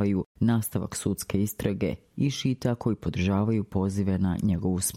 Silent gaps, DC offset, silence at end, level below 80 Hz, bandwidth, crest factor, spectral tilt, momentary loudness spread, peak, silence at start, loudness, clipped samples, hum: 0.26-0.35 s; under 0.1%; 0 s; -50 dBFS; 16.5 kHz; 16 dB; -6 dB/octave; 4 LU; -12 dBFS; 0 s; -27 LUFS; under 0.1%; none